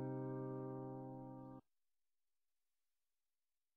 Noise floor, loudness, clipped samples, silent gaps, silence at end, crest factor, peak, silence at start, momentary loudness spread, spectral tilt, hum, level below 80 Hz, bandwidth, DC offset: under -90 dBFS; -49 LUFS; under 0.1%; none; 2.15 s; 16 dB; -36 dBFS; 0 s; 11 LU; -11.5 dB/octave; none; -80 dBFS; 2.3 kHz; under 0.1%